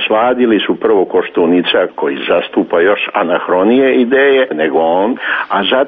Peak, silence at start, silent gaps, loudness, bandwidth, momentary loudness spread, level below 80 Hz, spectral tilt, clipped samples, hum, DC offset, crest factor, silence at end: -2 dBFS; 0 s; none; -12 LUFS; 4.8 kHz; 5 LU; -54 dBFS; -2 dB/octave; under 0.1%; none; under 0.1%; 10 dB; 0 s